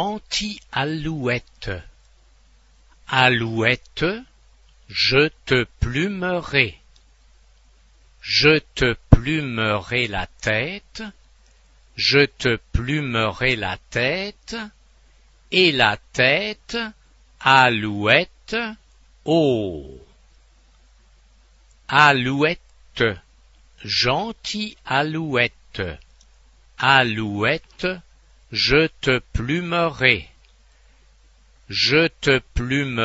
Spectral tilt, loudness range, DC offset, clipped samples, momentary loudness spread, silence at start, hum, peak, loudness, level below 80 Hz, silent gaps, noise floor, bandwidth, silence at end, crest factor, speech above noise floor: -5 dB/octave; 4 LU; under 0.1%; under 0.1%; 15 LU; 0 s; none; 0 dBFS; -20 LUFS; -38 dBFS; none; -54 dBFS; 8 kHz; 0 s; 22 dB; 33 dB